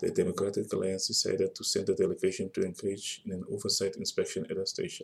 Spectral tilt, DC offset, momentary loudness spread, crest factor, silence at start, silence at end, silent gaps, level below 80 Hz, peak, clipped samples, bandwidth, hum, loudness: -3.5 dB/octave; under 0.1%; 7 LU; 16 dB; 0 s; 0 s; none; -70 dBFS; -16 dBFS; under 0.1%; 14.5 kHz; none; -31 LUFS